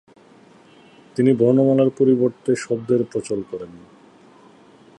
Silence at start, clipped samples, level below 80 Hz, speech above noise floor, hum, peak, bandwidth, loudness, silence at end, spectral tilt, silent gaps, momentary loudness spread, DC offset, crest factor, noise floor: 1.15 s; under 0.1%; -64 dBFS; 31 dB; none; -4 dBFS; 11 kHz; -19 LUFS; 1.2 s; -7.5 dB/octave; none; 16 LU; under 0.1%; 18 dB; -49 dBFS